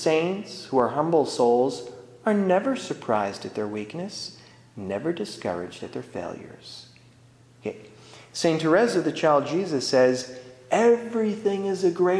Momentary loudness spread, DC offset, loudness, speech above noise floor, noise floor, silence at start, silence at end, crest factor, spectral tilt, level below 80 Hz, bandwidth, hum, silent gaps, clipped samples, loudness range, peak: 17 LU; under 0.1%; -24 LUFS; 30 dB; -54 dBFS; 0 s; 0 s; 18 dB; -5 dB/octave; -68 dBFS; 11 kHz; none; none; under 0.1%; 11 LU; -6 dBFS